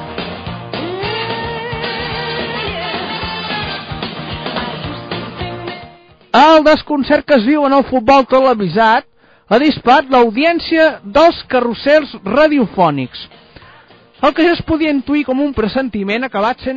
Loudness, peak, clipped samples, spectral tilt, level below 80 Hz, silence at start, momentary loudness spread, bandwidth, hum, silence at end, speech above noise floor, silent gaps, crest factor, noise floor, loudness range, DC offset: -14 LUFS; 0 dBFS; under 0.1%; -3 dB/octave; -40 dBFS; 0 s; 14 LU; 7.4 kHz; none; 0 s; 31 dB; none; 14 dB; -43 dBFS; 9 LU; under 0.1%